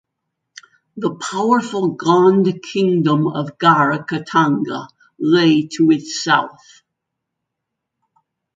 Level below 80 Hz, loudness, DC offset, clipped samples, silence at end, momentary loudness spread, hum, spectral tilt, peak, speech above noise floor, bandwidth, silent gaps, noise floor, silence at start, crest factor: -66 dBFS; -16 LUFS; under 0.1%; under 0.1%; 2.05 s; 10 LU; none; -5.5 dB/octave; 0 dBFS; 63 dB; 9.2 kHz; none; -79 dBFS; 0.95 s; 18 dB